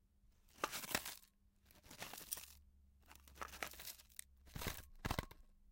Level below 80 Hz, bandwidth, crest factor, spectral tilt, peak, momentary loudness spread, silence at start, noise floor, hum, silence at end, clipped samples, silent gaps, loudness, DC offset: -60 dBFS; 17 kHz; 32 dB; -2.5 dB/octave; -18 dBFS; 20 LU; 0.25 s; -72 dBFS; none; 0 s; under 0.1%; none; -48 LUFS; under 0.1%